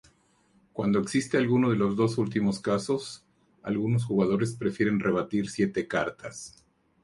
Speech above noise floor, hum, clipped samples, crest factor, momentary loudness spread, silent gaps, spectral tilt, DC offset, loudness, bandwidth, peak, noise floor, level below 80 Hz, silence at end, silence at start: 38 dB; none; under 0.1%; 18 dB; 15 LU; none; -6.5 dB/octave; under 0.1%; -27 LUFS; 11.5 kHz; -10 dBFS; -65 dBFS; -60 dBFS; 0.55 s; 0.75 s